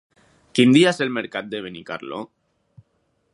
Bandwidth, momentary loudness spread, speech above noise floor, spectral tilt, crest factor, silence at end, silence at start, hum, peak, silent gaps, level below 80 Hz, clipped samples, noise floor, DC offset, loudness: 11.5 kHz; 19 LU; 49 dB; -5 dB/octave; 20 dB; 1.1 s; 0.55 s; none; -2 dBFS; none; -66 dBFS; under 0.1%; -68 dBFS; under 0.1%; -20 LUFS